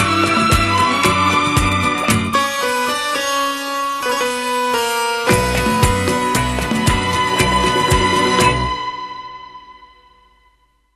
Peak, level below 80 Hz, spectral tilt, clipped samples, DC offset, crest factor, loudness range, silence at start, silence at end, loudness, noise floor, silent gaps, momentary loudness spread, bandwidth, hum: 0 dBFS; -30 dBFS; -4 dB/octave; under 0.1%; under 0.1%; 16 dB; 2 LU; 0 s; 1.1 s; -16 LUFS; -57 dBFS; none; 7 LU; 13 kHz; none